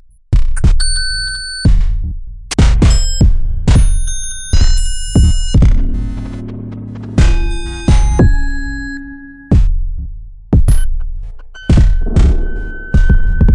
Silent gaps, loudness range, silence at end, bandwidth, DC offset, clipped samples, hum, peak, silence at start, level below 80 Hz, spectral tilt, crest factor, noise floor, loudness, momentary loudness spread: none; 3 LU; 0 s; 11.5 kHz; under 0.1%; under 0.1%; none; 0 dBFS; 0.3 s; -12 dBFS; -5.5 dB/octave; 10 dB; -31 dBFS; -15 LUFS; 14 LU